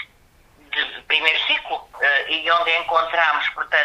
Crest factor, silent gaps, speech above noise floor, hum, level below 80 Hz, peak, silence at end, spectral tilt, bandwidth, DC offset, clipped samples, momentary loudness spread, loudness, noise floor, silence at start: 18 dB; none; 34 dB; none; -58 dBFS; -2 dBFS; 0 s; -1 dB/octave; 15 kHz; under 0.1%; under 0.1%; 7 LU; -19 LUFS; -54 dBFS; 0 s